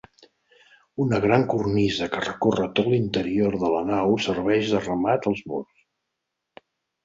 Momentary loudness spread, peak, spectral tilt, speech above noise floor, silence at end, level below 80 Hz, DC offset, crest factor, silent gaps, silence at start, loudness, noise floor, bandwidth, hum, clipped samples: 7 LU; -4 dBFS; -6.5 dB/octave; 59 dB; 1.4 s; -52 dBFS; under 0.1%; 20 dB; none; 1 s; -23 LUFS; -81 dBFS; 7.8 kHz; none; under 0.1%